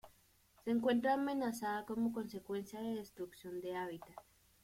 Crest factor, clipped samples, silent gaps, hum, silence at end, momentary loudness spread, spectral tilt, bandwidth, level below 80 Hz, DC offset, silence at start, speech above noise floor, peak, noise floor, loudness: 18 dB; under 0.1%; none; none; 0.4 s; 15 LU; -5.5 dB/octave; 16.5 kHz; -74 dBFS; under 0.1%; 0.05 s; 31 dB; -22 dBFS; -70 dBFS; -40 LUFS